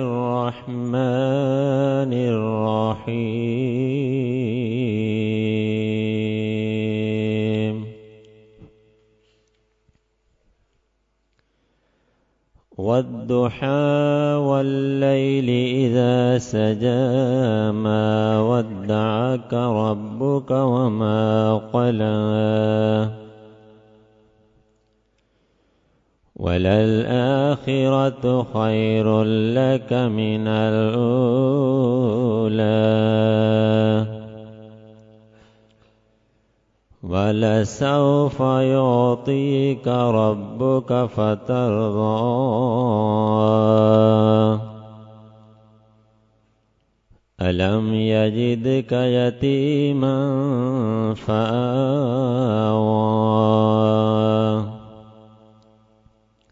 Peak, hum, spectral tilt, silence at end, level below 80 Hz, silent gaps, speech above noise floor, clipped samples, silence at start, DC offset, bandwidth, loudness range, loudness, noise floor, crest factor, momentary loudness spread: -4 dBFS; none; -8 dB/octave; 1.5 s; -58 dBFS; none; 50 dB; under 0.1%; 0 s; under 0.1%; 7.8 kHz; 7 LU; -20 LUFS; -69 dBFS; 16 dB; 6 LU